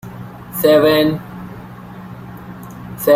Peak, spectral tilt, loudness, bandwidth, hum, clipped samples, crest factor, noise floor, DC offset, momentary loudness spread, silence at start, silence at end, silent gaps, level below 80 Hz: -2 dBFS; -5.5 dB/octave; -15 LUFS; 16 kHz; none; under 0.1%; 16 dB; -34 dBFS; under 0.1%; 22 LU; 0.05 s; 0 s; none; -48 dBFS